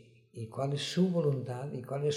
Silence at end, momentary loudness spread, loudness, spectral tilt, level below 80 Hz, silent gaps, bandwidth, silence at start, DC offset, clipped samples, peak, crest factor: 0 s; 15 LU; -33 LUFS; -6.5 dB/octave; -74 dBFS; none; 13.5 kHz; 0.35 s; under 0.1%; under 0.1%; -18 dBFS; 16 dB